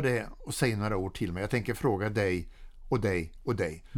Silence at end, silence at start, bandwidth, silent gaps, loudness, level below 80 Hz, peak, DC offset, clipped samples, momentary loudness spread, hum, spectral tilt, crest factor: 0 s; 0 s; 18 kHz; none; -31 LUFS; -46 dBFS; -12 dBFS; under 0.1%; under 0.1%; 5 LU; none; -6 dB/octave; 20 dB